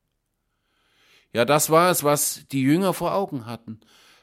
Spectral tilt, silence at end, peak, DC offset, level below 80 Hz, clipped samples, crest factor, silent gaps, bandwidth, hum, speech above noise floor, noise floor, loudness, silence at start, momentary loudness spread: -4 dB/octave; 0.45 s; -4 dBFS; under 0.1%; -64 dBFS; under 0.1%; 20 dB; none; 16.5 kHz; none; 53 dB; -75 dBFS; -21 LUFS; 1.35 s; 17 LU